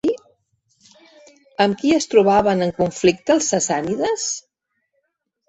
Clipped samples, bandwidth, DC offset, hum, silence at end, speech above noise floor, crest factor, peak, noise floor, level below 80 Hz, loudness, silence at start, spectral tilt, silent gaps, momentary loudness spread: under 0.1%; 8.4 kHz; under 0.1%; none; 1.1 s; 56 dB; 18 dB; -2 dBFS; -73 dBFS; -54 dBFS; -18 LUFS; 0.05 s; -4 dB/octave; none; 10 LU